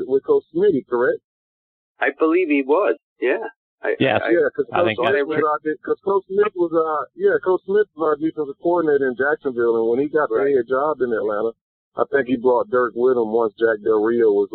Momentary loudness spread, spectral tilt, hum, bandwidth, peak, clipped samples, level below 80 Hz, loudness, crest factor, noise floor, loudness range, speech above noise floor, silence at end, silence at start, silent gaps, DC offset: 6 LU; -4 dB/octave; none; 4.3 kHz; -2 dBFS; under 0.1%; -64 dBFS; -20 LUFS; 16 dB; under -90 dBFS; 1 LU; over 71 dB; 0.1 s; 0 s; 1.24-1.95 s, 3.03-3.16 s, 3.56-3.78 s, 11.61-11.92 s; under 0.1%